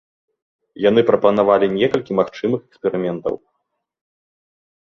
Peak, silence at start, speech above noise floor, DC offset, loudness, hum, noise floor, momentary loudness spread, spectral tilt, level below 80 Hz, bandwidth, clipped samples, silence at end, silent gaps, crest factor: -2 dBFS; 0.75 s; 57 dB; under 0.1%; -18 LUFS; none; -74 dBFS; 10 LU; -7.5 dB/octave; -58 dBFS; 7 kHz; under 0.1%; 1.6 s; none; 18 dB